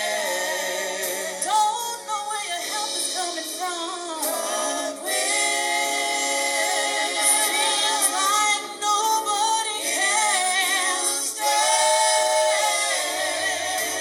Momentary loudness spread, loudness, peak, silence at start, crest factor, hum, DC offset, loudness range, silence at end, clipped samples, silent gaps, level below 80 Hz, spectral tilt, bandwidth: 8 LU; -21 LUFS; -6 dBFS; 0 s; 18 dB; none; under 0.1%; 5 LU; 0 s; under 0.1%; none; -80 dBFS; 1.5 dB/octave; over 20 kHz